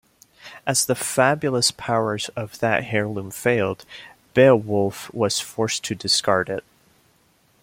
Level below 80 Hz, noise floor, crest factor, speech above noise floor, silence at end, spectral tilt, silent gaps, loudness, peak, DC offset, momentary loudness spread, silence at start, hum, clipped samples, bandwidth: -60 dBFS; -61 dBFS; 20 dB; 39 dB; 1 s; -3.5 dB/octave; none; -21 LUFS; -2 dBFS; under 0.1%; 12 LU; 0.45 s; none; under 0.1%; 16.5 kHz